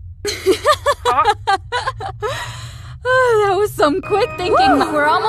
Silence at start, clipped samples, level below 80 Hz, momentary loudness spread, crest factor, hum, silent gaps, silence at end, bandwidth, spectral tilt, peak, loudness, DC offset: 0 s; under 0.1%; -40 dBFS; 12 LU; 14 dB; none; none; 0 s; 14 kHz; -4 dB/octave; -2 dBFS; -16 LUFS; under 0.1%